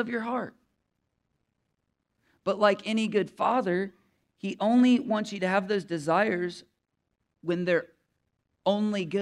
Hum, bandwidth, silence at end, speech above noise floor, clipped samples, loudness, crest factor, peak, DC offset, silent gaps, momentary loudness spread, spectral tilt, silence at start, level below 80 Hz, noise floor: none; 11 kHz; 0 s; 53 dB; under 0.1%; -27 LUFS; 20 dB; -8 dBFS; under 0.1%; none; 13 LU; -6 dB/octave; 0 s; -76 dBFS; -80 dBFS